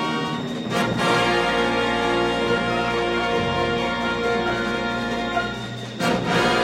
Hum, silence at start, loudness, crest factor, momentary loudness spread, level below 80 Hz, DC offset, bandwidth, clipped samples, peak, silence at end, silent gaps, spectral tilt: none; 0 s; -22 LUFS; 14 dB; 6 LU; -44 dBFS; under 0.1%; 16 kHz; under 0.1%; -8 dBFS; 0 s; none; -5 dB/octave